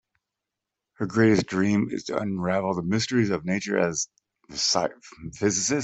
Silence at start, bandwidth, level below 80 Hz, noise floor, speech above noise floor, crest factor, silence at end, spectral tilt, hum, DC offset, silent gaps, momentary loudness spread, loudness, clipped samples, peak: 1 s; 8.4 kHz; -60 dBFS; -86 dBFS; 61 dB; 18 dB; 0 s; -4 dB/octave; none; under 0.1%; none; 11 LU; -25 LUFS; under 0.1%; -8 dBFS